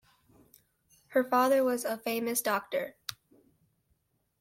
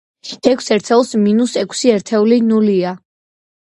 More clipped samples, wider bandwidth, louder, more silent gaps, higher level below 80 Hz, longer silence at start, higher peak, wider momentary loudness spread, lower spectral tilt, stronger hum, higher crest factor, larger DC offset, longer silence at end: neither; first, 16.5 kHz vs 11.5 kHz; second, -30 LUFS vs -14 LUFS; neither; second, -76 dBFS vs -60 dBFS; first, 1.1 s vs 0.25 s; second, -12 dBFS vs 0 dBFS; first, 13 LU vs 6 LU; second, -3 dB/octave vs -5 dB/octave; neither; first, 22 dB vs 14 dB; neither; first, 1.3 s vs 0.8 s